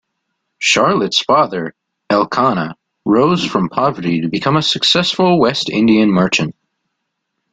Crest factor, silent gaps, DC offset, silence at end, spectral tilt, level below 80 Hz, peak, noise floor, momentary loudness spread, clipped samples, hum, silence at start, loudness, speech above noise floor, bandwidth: 16 dB; none; under 0.1%; 1 s; -4.5 dB/octave; -52 dBFS; 0 dBFS; -73 dBFS; 7 LU; under 0.1%; none; 0.6 s; -14 LUFS; 60 dB; 9.4 kHz